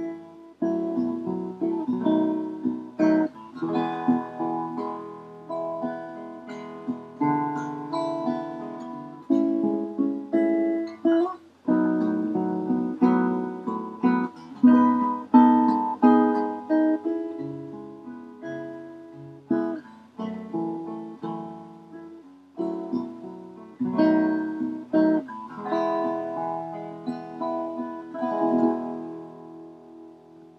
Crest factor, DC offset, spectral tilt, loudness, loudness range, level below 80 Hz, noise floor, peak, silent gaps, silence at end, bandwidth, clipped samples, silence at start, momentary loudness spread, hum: 22 dB; under 0.1%; -8.5 dB/octave; -25 LUFS; 12 LU; -78 dBFS; -49 dBFS; -4 dBFS; none; 0.1 s; 6 kHz; under 0.1%; 0 s; 19 LU; none